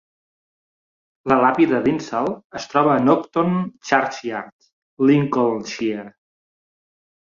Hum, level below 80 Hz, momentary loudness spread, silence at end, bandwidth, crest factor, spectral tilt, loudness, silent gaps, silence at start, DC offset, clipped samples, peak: none; -60 dBFS; 13 LU; 1.15 s; 7.4 kHz; 20 dB; -6.5 dB/octave; -19 LUFS; 2.44-2.50 s, 4.52-4.59 s, 4.73-4.97 s; 1.25 s; under 0.1%; under 0.1%; -2 dBFS